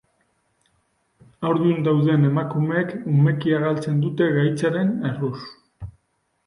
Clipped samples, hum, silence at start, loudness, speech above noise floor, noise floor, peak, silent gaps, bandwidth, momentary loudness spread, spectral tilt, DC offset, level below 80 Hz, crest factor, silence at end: under 0.1%; none; 1.4 s; -21 LUFS; 50 dB; -70 dBFS; -8 dBFS; none; 10.5 kHz; 19 LU; -8.5 dB/octave; under 0.1%; -56 dBFS; 14 dB; 0.55 s